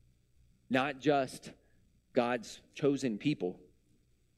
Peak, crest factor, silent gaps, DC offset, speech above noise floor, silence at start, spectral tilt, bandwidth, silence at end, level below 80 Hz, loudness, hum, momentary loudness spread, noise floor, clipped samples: -14 dBFS; 22 dB; none; under 0.1%; 37 dB; 0.7 s; -5.5 dB/octave; 13.5 kHz; 0.8 s; -70 dBFS; -34 LUFS; 60 Hz at -70 dBFS; 12 LU; -70 dBFS; under 0.1%